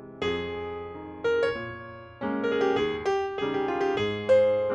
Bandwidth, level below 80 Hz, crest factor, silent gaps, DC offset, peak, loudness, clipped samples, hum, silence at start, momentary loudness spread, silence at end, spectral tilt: 8.4 kHz; -58 dBFS; 16 dB; none; under 0.1%; -12 dBFS; -27 LUFS; under 0.1%; none; 0 s; 15 LU; 0 s; -6 dB/octave